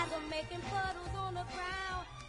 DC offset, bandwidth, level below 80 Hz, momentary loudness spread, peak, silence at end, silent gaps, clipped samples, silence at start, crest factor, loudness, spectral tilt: under 0.1%; 11 kHz; -52 dBFS; 3 LU; -22 dBFS; 0 s; none; under 0.1%; 0 s; 18 dB; -39 LUFS; -4.5 dB/octave